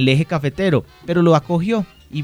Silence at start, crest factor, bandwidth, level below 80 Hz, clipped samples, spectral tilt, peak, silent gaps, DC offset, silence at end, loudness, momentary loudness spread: 0 s; 18 dB; 10.5 kHz; -48 dBFS; under 0.1%; -7.5 dB/octave; 0 dBFS; none; under 0.1%; 0 s; -18 LUFS; 7 LU